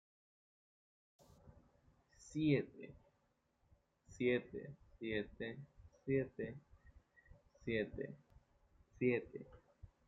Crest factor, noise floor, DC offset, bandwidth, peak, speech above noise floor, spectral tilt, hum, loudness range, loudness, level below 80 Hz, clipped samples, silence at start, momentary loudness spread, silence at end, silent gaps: 22 dB; -81 dBFS; under 0.1%; 8.8 kHz; -22 dBFS; 40 dB; -7 dB/octave; none; 3 LU; -42 LUFS; -68 dBFS; under 0.1%; 1.45 s; 21 LU; 0.2 s; none